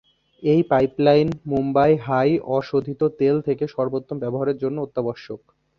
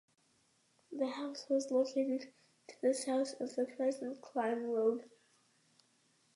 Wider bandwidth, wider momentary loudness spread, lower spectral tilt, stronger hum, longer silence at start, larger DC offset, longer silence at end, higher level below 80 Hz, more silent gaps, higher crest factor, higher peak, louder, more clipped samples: second, 6.4 kHz vs 11.5 kHz; about the same, 10 LU vs 9 LU; first, -9 dB/octave vs -3.5 dB/octave; neither; second, 0.4 s vs 0.9 s; neither; second, 0.4 s vs 1.3 s; first, -54 dBFS vs under -90 dBFS; neither; about the same, 18 dB vs 16 dB; first, -4 dBFS vs -22 dBFS; first, -21 LUFS vs -37 LUFS; neither